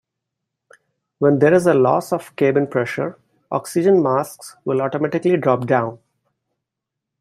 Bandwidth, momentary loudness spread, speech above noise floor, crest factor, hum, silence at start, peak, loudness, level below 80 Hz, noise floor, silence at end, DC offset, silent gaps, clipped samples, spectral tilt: 14 kHz; 12 LU; 65 dB; 16 dB; none; 1.2 s; -2 dBFS; -18 LUFS; -64 dBFS; -82 dBFS; 1.25 s; under 0.1%; none; under 0.1%; -7 dB/octave